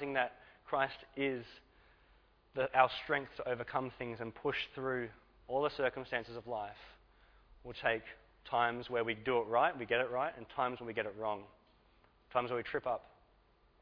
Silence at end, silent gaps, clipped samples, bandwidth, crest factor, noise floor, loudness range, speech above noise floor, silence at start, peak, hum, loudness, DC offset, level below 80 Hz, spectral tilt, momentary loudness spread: 0.75 s; none; under 0.1%; 5.4 kHz; 26 dB; -69 dBFS; 4 LU; 32 dB; 0 s; -12 dBFS; none; -37 LUFS; under 0.1%; -68 dBFS; -2.5 dB/octave; 11 LU